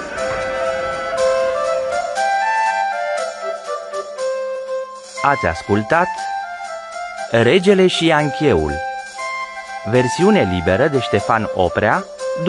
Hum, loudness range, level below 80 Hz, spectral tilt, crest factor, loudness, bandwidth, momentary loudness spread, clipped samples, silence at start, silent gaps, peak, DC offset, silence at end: none; 4 LU; -44 dBFS; -5 dB/octave; 18 dB; -18 LUFS; 11.5 kHz; 12 LU; under 0.1%; 0 s; none; 0 dBFS; under 0.1%; 0 s